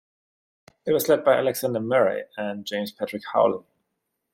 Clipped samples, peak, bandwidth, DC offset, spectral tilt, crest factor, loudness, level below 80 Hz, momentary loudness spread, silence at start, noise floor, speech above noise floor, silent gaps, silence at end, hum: under 0.1%; -6 dBFS; 16 kHz; under 0.1%; -4.5 dB/octave; 18 dB; -24 LUFS; -68 dBFS; 12 LU; 0.85 s; -79 dBFS; 56 dB; none; 0.75 s; none